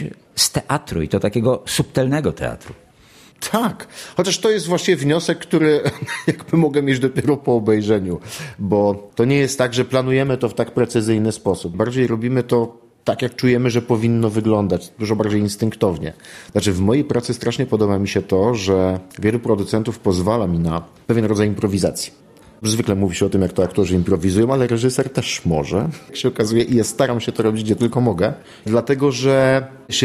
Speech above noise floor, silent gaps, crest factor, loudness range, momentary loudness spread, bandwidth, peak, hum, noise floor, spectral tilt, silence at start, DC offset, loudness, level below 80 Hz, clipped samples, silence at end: 30 dB; none; 16 dB; 2 LU; 6 LU; 14.5 kHz; -2 dBFS; none; -48 dBFS; -5.5 dB/octave; 0 s; under 0.1%; -19 LUFS; -46 dBFS; under 0.1%; 0 s